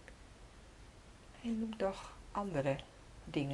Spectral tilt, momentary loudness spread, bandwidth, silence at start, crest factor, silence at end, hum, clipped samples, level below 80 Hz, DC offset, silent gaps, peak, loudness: -6.5 dB/octave; 21 LU; 12 kHz; 0 s; 20 dB; 0 s; none; under 0.1%; -58 dBFS; under 0.1%; none; -22 dBFS; -40 LUFS